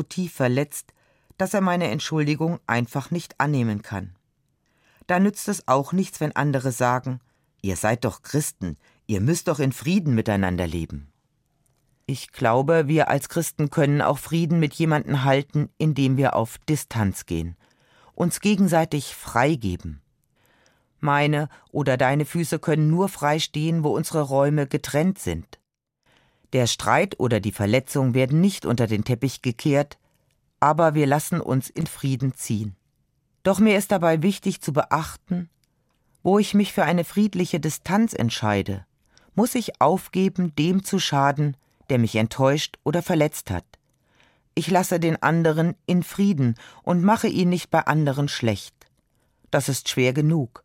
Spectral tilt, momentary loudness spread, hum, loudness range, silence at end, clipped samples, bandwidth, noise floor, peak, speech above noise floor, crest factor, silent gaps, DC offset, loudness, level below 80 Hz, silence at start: -6 dB/octave; 10 LU; none; 3 LU; 0.2 s; under 0.1%; 16.5 kHz; -70 dBFS; -2 dBFS; 48 dB; 22 dB; none; under 0.1%; -23 LUFS; -54 dBFS; 0 s